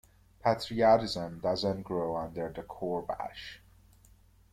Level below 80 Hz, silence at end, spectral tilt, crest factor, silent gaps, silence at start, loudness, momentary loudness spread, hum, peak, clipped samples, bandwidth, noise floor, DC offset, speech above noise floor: -60 dBFS; 0.95 s; -6 dB/octave; 20 dB; none; 0.45 s; -31 LUFS; 14 LU; none; -12 dBFS; under 0.1%; 14.5 kHz; -61 dBFS; under 0.1%; 30 dB